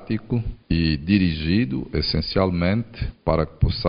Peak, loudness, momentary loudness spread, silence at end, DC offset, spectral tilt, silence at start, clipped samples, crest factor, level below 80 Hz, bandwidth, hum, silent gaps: -4 dBFS; -23 LUFS; 7 LU; 0 s; under 0.1%; -11 dB/octave; 0 s; under 0.1%; 18 dB; -34 dBFS; 5.4 kHz; none; none